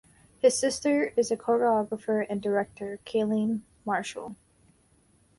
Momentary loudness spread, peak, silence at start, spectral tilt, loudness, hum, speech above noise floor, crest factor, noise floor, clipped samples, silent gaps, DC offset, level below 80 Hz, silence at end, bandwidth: 11 LU; -10 dBFS; 0.45 s; -4.5 dB/octave; -27 LUFS; none; 37 dB; 20 dB; -64 dBFS; under 0.1%; none; under 0.1%; -66 dBFS; 1.05 s; 11.5 kHz